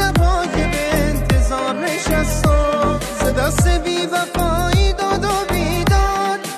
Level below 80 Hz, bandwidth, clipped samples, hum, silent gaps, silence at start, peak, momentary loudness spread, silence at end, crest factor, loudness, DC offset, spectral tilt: -22 dBFS; 14 kHz; under 0.1%; none; none; 0 s; -6 dBFS; 3 LU; 0 s; 12 dB; -17 LUFS; under 0.1%; -5 dB/octave